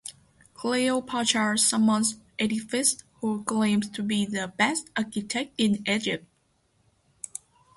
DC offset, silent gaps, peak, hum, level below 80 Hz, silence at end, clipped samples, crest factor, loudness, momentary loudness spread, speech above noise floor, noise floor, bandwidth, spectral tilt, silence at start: under 0.1%; none; -8 dBFS; none; -66 dBFS; 1.6 s; under 0.1%; 20 dB; -26 LUFS; 13 LU; 43 dB; -68 dBFS; 12 kHz; -3 dB/octave; 0.05 s